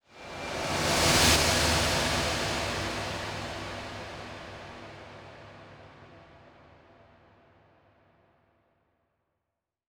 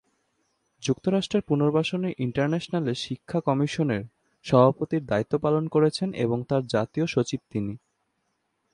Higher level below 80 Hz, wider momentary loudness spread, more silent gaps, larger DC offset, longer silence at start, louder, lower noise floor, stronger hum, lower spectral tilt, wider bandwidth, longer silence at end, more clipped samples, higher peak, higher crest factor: first, -44 dBFS vs -60 dBFS; first, 26 LU vs 10 LU; neither; neither; second, 0.15 s vs 0.8 s; about the same, -26 LUFS vs -26 LUFS; first, -86 dBFS vs -75 dBFS; neither; second, -2.5 dB/octave vs -6.5 dB/octave; first, over 20 kHz vs 11 kHz; first, 3.55 s vs 0.95 s; neither; second, -8 dBFS vs -4 dBFS; about the same, 24 dB vs 22 dB